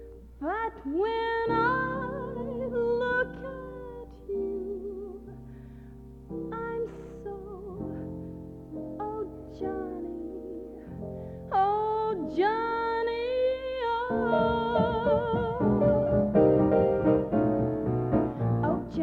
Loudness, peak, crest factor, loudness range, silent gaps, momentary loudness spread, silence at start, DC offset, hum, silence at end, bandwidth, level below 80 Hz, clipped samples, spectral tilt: -28 LUFS; -10 dBFS; 18 dB; 13 LU; none; 17 LU; 0 s; under 0.1%; none; 0 s; 5.8 kHz; -48 dBFS; under 0.1%; -9 dB/octave